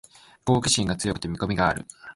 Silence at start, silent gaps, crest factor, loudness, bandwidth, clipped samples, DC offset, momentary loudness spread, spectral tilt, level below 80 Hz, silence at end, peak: 0.45 s; none; 20 dB; -25 LUFS; 11.5 kHz; under 0.1%; under 0.1%; 10 LU; -4 dB/octave; -46 dBFS; 0.05 s; -6 dBFS